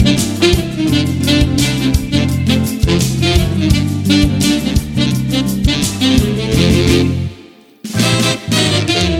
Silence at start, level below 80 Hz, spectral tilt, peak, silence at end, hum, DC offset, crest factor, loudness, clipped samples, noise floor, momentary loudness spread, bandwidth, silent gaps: 0 s; -24 dBFS; -5 dB/octave; 0 dBFS; 0 s; none; under 0.1%; 14 dB; -13 LUFS; under 0.1%; -40 dBFS; 4 LU; 16.5 kHz; none